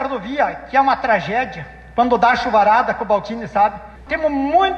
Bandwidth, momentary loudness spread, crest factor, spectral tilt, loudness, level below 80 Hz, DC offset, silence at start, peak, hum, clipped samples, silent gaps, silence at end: 8 kHz; 10 LU; 14 dB; -5.5 dB/octave; -17 LUFS; -44 dBFS; under 0.1%; 0 s; -4 dBFS; none; under 0.1%; none; 0 s